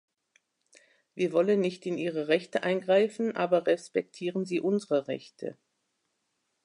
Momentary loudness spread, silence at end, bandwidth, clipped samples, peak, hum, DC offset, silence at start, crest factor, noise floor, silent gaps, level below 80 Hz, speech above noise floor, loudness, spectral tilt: 12 LU; 1.1 s; 11 kHz; under 0.1%; -10 dBFS; none; under 0.1%; 1.15 s; 18 dB; -79 dBFS; none; -82 dBFS; 51 dB; -29 LUFS; -6 dB/octave